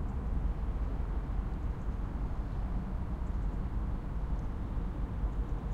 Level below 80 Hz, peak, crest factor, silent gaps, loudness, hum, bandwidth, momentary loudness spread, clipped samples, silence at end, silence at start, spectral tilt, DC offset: -36 dBFS; -22 dBFS; 12 dB; none; -38 LUFS; none; 4.5 kHz; 2 LU; under 0.1%; 0 s; 0 s; -9 dB/octave; under 0.1%